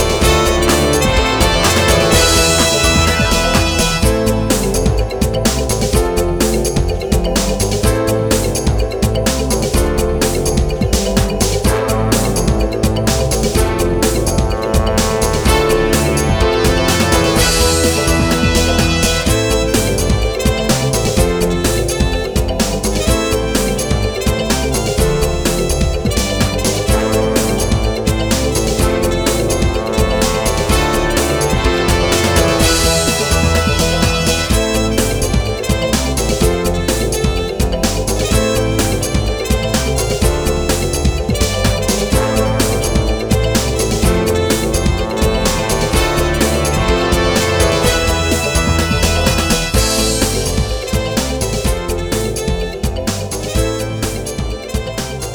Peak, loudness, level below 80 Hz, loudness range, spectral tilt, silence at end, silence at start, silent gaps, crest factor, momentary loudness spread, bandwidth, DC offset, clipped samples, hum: 0 dBFS; -14 LUFS; -20 dBFS; 3 LU; -4 dB/octave; 0 s; 0 s; none; 14 dB; 5 LU; over 20 kHz; under 0.1%; under 0.1%; none